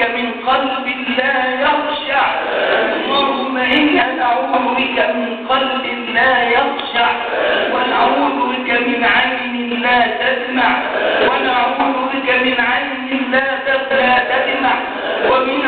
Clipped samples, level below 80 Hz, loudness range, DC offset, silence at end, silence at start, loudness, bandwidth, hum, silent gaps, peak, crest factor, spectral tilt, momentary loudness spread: under 0.1%; -50 dBFS; 1 LU; under 0.1%; 0 s; 0 s; -15 LUFS; 4.7 kHz; none; none; -2 dBFS; 12 dB; -6.5 dB/octave; 5 LU